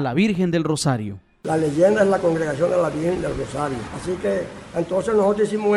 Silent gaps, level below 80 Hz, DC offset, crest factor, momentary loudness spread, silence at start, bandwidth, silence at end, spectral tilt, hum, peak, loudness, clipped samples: none; -48 dBFS; under 0.1%; 16 dB; 10 LU; 0 s; 13.5 kHz; 0 s; -6 dB/octave; none; -4 dBFS; -21 LUFS; under 0.1%